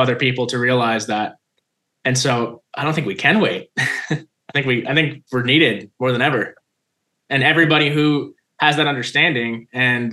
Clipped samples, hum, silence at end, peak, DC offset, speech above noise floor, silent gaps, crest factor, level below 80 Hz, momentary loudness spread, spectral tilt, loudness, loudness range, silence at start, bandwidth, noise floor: under 0.1%; none; 0 s; 0 dBFS; under 0.1%; 56 dB; none; 18 dB; -64 dBFS; 9 LU; -4.5 dB/octave; -18 LUFS; 3 LU; 0 s; 12.5 kHz; -74 dBFS